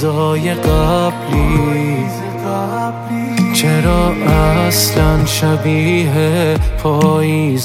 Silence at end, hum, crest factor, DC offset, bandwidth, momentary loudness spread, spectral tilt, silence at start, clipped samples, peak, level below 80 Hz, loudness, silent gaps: 0 s; none; 12 dB; under 0.1%; 16.5 kHz; 7 LU; -5.5 dB/octave; 0 s; under 0.1%; 0 dBFS; -24 dBFS; -14 LUFS; none